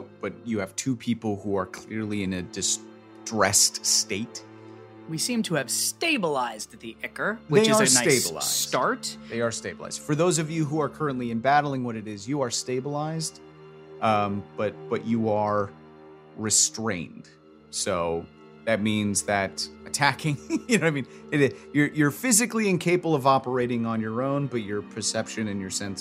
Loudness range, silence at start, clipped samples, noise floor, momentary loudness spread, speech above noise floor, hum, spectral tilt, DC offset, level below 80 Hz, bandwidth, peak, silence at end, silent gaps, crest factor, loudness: 5 LU; 0 s; under 0.1%; -48 dBFS; 13 LU; 23 dB; none; -3.5 dB/octave; under 0.1%; -62 dBFS; 16 kHz; -4 dBFS; 0 s; none; 22 dB; -25 LUFS